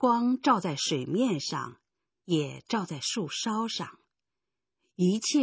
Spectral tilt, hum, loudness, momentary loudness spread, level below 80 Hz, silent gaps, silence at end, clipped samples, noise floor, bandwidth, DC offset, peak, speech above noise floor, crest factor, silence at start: -4.5 dB/octave; none; -29 LUFS; 9 LU; -76 dBFS; none; 0 s; under 0.1%; -90 dBFS; 8 kHz; under 0.1%; -10 dBFS; 62 dB; 20 dB; 0 s